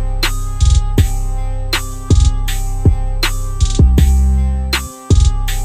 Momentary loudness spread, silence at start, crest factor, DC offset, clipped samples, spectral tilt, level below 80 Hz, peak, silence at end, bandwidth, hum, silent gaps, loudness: 7 LU; 0 s; 12 dB; under 0.1%; under 0.1%; -5 dB/octave; -14 dBFS; 0 dBFS; 0 s; 15 kHz; none; none; -16 LUFS